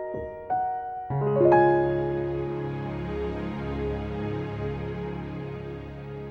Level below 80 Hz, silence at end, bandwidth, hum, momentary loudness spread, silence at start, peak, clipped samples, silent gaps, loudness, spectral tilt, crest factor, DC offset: -44 dBFS; 0 s; 5.4 kHz; none; 16 LU; 0 s; -8 dBFS; under 0.1%; none; -27 LUFS; -9.5 dB/octave; 20 dB; under 0.1%